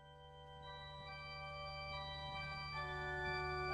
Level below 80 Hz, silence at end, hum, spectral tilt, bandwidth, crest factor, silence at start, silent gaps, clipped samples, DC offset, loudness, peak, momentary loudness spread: -58 dBFS; 0 s; none; -5 dB/octave; 11 kHz; 16 dB; 0 s; none; under 0.1%; under 0.1%; -46 LUFS; -32 dBFS; 13 LU